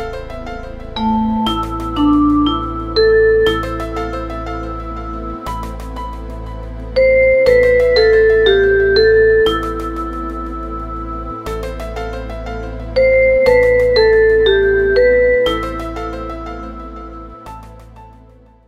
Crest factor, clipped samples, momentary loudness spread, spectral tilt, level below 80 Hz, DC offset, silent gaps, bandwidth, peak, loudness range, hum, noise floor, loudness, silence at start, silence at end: 14 dB; under 0.1%; 18 LU; -6.5 dB/octave; -28 dBFS; under 0.1%; none; 13.5 kHz; 0 dBFS; 11 LU; none; -44 dBFS; -14 LUFS; 0 s; 0.55 s